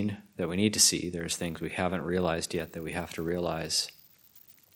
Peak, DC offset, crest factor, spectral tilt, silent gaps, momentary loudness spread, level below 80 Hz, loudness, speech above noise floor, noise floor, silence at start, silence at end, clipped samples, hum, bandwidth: -6 dBFS; under 0.1%; 24 dB; -3 dB/octave; none; 13 LU; -56 dBFS; -29 LUFS; 28 dB; -58 dBFS; 0 s; 0.25 s; under 0.1%; none; 17 kHz